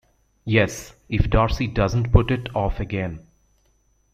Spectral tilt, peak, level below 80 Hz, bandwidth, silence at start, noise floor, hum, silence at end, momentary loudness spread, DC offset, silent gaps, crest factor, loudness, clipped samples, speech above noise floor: -6.5 dB/octave; -2 dBFS; -30 dBFS; 15 kHz; 0.45 s; -63 dBFS; none; 0.95 s; 12 LU; under 0.1%; none; 20 dB; -22 LUFS; under 0.1%; 42 dB